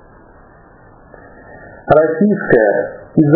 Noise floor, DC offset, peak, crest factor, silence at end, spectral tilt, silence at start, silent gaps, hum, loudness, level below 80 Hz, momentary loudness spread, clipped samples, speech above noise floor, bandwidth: -43 dBFS; under 0.1%; 0 dBFS; 16 dB; 0 s; -12.5 dB/octave; 1.55 s; none; none; -13 LUFS; -46 dBFS; 8 LU; 0.1%; 31 dB; 4 kHz